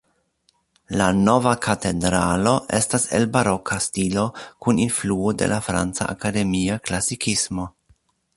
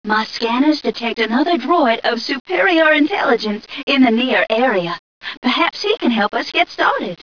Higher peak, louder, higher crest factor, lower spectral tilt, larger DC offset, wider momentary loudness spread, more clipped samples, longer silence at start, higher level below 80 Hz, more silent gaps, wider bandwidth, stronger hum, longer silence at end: about the same, -2 dBFS vs -4 dBFS; second, -21 LUFS vs -16 LUFS; first, 20 dB vs 14 dB; about the same, -4.5 dB/octave vs -4.5 dB/octave; second, under 0.1% vs 0.4%; about the same, 6 LU vs 8 LU; neither; first, 0.9 s vs 0.05 s; first, -44 dBFS vs -62 dBFS; second, none vs 2.40-2.45 s, 3.83-3.87 s, 4.99-5.21 s, 5.37-5.42 s; first, 11.5 kHz vs 5.4 kHz; neither; first, 0.7 s vs 0.1 s